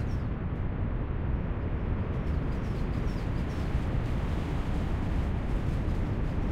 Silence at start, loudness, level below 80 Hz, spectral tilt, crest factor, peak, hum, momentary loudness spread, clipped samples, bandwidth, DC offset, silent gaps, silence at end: 0 s; -32 LUFS; -32 dBFS; -8.5 dB/octave; 12 dB; -16 dBFS; none; 2 LU; under 0.1%; 9.6 kHz; under 0.1%; none; 0 s